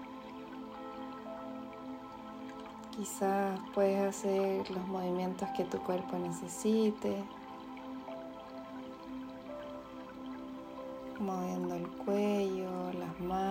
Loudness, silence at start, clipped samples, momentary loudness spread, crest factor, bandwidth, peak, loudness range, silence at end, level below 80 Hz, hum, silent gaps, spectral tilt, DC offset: -38 LUFS; 0 s; under 0.1%; 14 LU; 18 dB; 16 kHz; -18 dBFS; 11 LU; 0 s; -68 dBFS; none; none; -6 dB/octave; under 0.1%